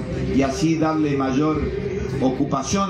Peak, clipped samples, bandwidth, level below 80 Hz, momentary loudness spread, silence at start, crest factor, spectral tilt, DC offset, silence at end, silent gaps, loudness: -8 dBFS; under 0.1%; 11 kHz; -36 dBFS; 5 LU; 0 s; 12 dB; -6 dB/octave; under 0.1%; 0 s; none; -21 LUFS